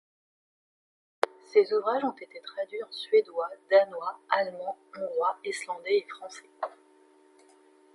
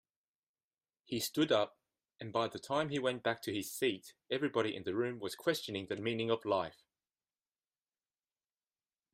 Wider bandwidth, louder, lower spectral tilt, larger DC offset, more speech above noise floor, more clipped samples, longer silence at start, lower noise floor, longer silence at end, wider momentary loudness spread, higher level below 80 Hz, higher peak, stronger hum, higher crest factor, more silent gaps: second, 11.5 kHz vs 15.5 kHz; first, -29 LUFS vs -36 LUFS; second, -3 dB/octave vs -4.5 dB/octave; neither; second, 31 dB vs over 54 dB; neither; first, 1.5 s vs 1.1 s; second, -60 dBFS vs under -90 dBFS; second, 1.25 s vs 2.4 s; first, 15 LU vs 7 LU; second, -86 dBFS vs -78 dBFS; first, -6 dBFS vs -18 dBFS; neither; about the same, 24 dB vs 20 dB; neither